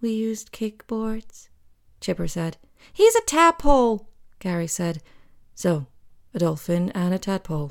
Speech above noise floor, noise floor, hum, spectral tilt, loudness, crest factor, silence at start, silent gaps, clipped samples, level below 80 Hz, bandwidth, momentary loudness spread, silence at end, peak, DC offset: 31 dB; -54 dBFS; none; -5 dB/octave; -23 LUFS; 20 dB; 0 s; none; under 0.1%; -38 dBFS; 18.5 kHz; 16 LU; 0 s; -4 dBFS; under 0.1%